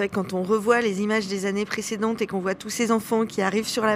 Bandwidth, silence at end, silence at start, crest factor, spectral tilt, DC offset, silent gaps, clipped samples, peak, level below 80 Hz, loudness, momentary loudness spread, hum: 16 kHz; 0 s; 0 s; 16 dB; -4.5 dB/octave; under 0.1%; none; under 0.1%; -8 dBFS; -60 dBFS; -24 LUFS; 6 LU; none